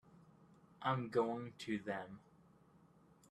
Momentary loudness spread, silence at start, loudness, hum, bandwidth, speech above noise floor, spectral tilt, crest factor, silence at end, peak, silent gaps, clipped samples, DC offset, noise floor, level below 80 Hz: 13 LU; 0.15 s; -41 LUFS; none; 12.5 kHz; 27 dB; -6.5 dB/octave; 22 dB; 1.1 s; -22 dBFS; none; under 0.1%; under 0.1%; -68 dBFS; -78 dBFS